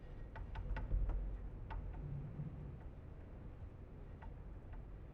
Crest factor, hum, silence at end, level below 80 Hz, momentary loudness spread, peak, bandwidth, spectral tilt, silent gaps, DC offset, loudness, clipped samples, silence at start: 18 dB; none; 0 s; -46 dBFS; 12 LU; -28 dBFS; 4.1 kHz; -8 dB/octave; none; under 0.1%; -49 LUFS; under 0.1%; 0 s